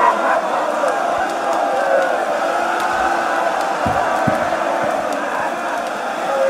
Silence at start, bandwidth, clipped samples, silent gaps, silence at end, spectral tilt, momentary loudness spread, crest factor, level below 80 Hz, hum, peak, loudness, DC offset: 0 s; 16 kHz; under 0.1%; none; 0 s; -4 dB/octave; 4 LU; 16 dB; -50 dBFS; none; -2 dBFS; -18 LUFS; under 0.1%